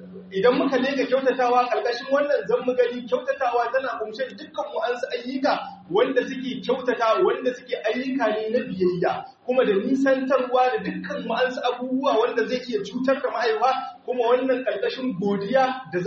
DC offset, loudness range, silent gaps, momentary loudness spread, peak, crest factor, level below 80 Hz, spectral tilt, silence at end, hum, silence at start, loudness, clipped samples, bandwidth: under 0.1%; 3 LU; none; 8 LU; -6 dBFS; 16 dB; -70 dBFS; -3.5 dB/octave; 0 s; none; 0 s; -23 LUFS; under 0.1%; 7.2 kHz